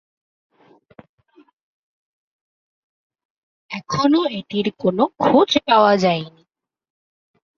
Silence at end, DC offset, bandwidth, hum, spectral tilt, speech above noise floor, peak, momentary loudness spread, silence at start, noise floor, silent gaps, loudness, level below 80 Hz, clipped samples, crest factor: 1.3 s; under 0.1%; 7.4 kHz; none; -5.5 dB/octave; 31 dB; -2 dBFS; 13 LU; 3.7 s; -49 dBFS; none; -17 LUFS; -62 dBFS; under 0.1%; 20 dB